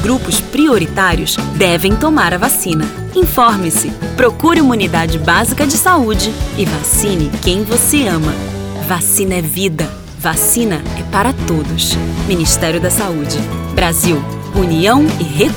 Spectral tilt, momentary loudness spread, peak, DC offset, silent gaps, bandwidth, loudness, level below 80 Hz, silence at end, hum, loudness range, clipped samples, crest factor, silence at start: -4 dB/octave; 7 LU; 0 dBFS; under 0.1%; none; over 20 kHz; -13 LUFS; -26 dBFS; 0 s; none; 2 LU; under 0.1%; 12 dB; 0 s